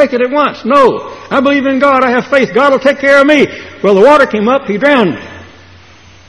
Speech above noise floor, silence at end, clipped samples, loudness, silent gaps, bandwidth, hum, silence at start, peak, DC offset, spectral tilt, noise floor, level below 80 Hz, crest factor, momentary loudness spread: 30 dB; 0.85 s; 0.6%; -9 LUFS; none; 11 kHz; none; 0 s; 0 dBFS; 0.3%; -5.5 dB/octave; -39 dBFS; -48 dBFS; 10 dB; 9 LU